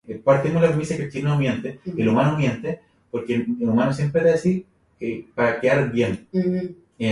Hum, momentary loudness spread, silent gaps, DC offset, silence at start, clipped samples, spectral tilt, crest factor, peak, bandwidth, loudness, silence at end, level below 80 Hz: none; 11 LU; none; under 0.1%; 0.1 s; under 0.1%; -7.5 dB/octave; 18 dB; -4 dBFS; 11.5 kHz; -22 LUFS; 0 s; -54 dBFS